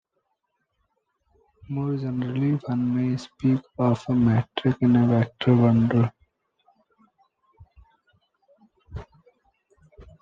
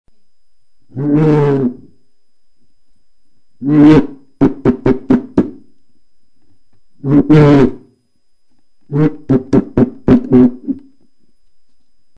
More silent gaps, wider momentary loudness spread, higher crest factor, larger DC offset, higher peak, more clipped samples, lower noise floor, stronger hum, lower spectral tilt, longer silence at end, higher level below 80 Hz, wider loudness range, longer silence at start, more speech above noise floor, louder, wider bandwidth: neither; second, 11 LU vs 16 LU; about the same, 18 dB vs 14 dB; second, under 0.1% vs 1%; second, -8 dBFS vs 0 dBFS; second, under 0.1% vs 0.3%; first, -76 dBFS vs -63 dBFS; neither; about the same, -9 dB/octave vs -9.5 dB/octave; second, 0.2 s vs 1.4 s; second, -54 dBFS vs -36 dBFS; first, 7 LU vs 4 LU; first, 1.7 s vs 0.95 s; about the same, 54 dB vs 54 dB; second, -23 LUFS vs -12 LUFS; about the same, 7.4 kHz vs 7 kHz